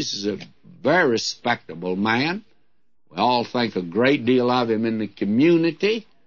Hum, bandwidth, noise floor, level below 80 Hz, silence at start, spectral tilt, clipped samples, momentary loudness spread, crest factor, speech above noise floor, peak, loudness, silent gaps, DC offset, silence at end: none; 7.4 kHz; -72 dBFS; -68 dBFS; 0 s; -5 dB/octave; under 0.1%; 9 LU; 16 dB; 51 dB; -6 dBFS; -21 LUFS; none; 0.2%; 0.25 s